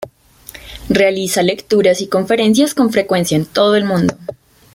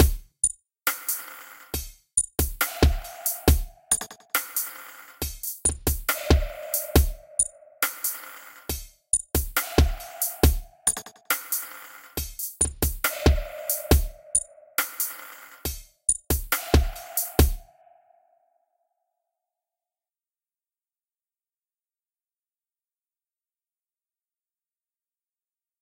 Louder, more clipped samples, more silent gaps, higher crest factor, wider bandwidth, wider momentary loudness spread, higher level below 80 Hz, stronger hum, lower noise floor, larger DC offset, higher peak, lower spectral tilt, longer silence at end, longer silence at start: first, -14 LUFS vs -26 LUFS; neither; neither; second, 14 dB vs 24 dB; about the same, 17 kHz vs 17 kHz; first, 19 LU vs 11 LU; second, -44 dBFS vs -32 dBFS; neither; second, -40 dBFS vs under -90 dBFS; neither; about the same, -2 dBFS vs -4 dBFS; first, -5 dB/octave vs -3.5 dB/octave; second, 0.4 s vs 8.2 s; about the same, 0 s vs 0 s